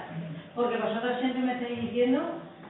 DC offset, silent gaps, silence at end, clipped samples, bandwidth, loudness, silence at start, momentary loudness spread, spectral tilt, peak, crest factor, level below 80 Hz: under 0.1%; none; 0 s; under 0.1%; 4.1 kHz; -30 LUFS; 0 s; 11 LU; -10 dB/octave; -16 dBFS; 14 dB; -72 dBFS